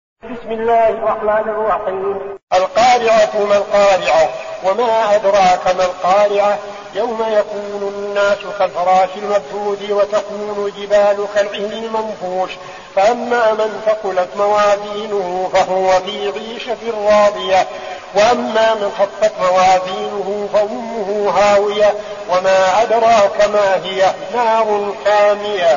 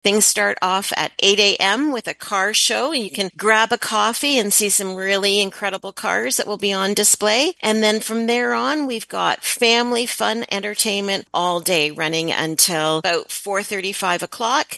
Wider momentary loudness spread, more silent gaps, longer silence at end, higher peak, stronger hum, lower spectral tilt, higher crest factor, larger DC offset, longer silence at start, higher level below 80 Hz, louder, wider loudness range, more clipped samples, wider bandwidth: about the same, 10 LU vs 8 LU; first, 2.43-2.47 s vs none; about the same, 0 s vs 0 s; about the same, -2 dBFS vs 0 dBFS; neither; about the same, -1.5 dB/octave vs -1.5 dB/octave; second, 12 dB vs 20 dB; neither; first, 0.25 s vs 0.05 s; first, -50 dBFS vs -68 dBFS; first, -15 LUFS vs -18 LUFS; about the same, 4 LU vs 2 LU; neither; second, 7.4 kHz vs 13 kHz